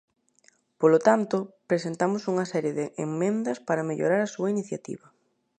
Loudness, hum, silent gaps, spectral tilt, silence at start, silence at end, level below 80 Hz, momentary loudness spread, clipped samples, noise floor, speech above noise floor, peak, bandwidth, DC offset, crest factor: -26 LUFS; none; none; -6.5 dB/octave; 0.8 s; 0.65 s; -76 dBFS; 10 LU; under 0.1%; -64 dBFS; 38 dB; -6 dBFS; 9.6 kHz; under 0.1%; 22 dB